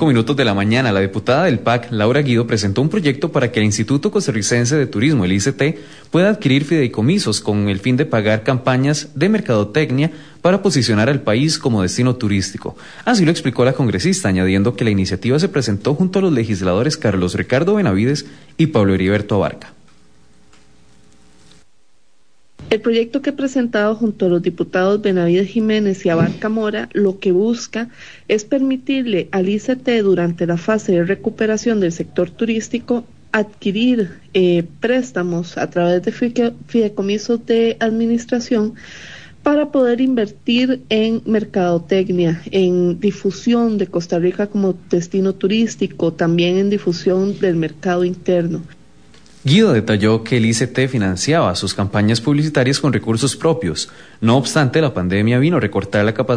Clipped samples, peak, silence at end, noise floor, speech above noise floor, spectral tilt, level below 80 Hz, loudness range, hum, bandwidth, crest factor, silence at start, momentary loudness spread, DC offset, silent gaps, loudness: under 0.1%; -2 dBFS; 0 s; -62 dBFS; 46 dB; -6 dB/octave; -52 dBFS; 3 LU; none; 10.5 kHz; 14 dB; 0 s; 5 LU; 0.5%; none; -17 LUFS